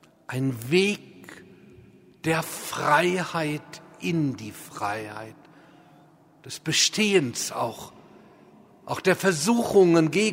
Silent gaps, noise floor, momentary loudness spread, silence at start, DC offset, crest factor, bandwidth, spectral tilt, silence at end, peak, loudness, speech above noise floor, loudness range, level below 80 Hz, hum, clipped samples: none; -55 dBFS; 20 LU; 0.3 s; under 0.1%; 20 dB; 16 kHz; -4 dB/octave; 0 s; -6 dBFS; -24 LUFS; 31 dB; 6 LU; -66 dBFS; none; under 0.1%